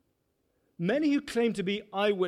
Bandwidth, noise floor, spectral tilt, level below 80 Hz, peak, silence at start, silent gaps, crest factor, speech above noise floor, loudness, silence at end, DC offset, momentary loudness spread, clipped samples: 13.5 kHz; -75 dBFS; -6 dB/octave; -68 dBFS; -16 dBFS; 0.8 s; none; 14 dB; 47 dB; -29 LUFS; 0 s; under 0.1%; 5 LU; under 0.1%